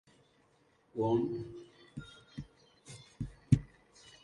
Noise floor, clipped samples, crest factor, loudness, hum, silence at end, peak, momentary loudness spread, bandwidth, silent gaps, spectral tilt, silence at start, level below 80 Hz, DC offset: -70 dBFS; under 0.1%; 26 dB; -34 LUFS; none; 0.55 s; -12 dBFS; 22 LU; 11.5 kHz; none; -8.5 dB/octave; 0.95 s; -54 dBFS; under 0.1%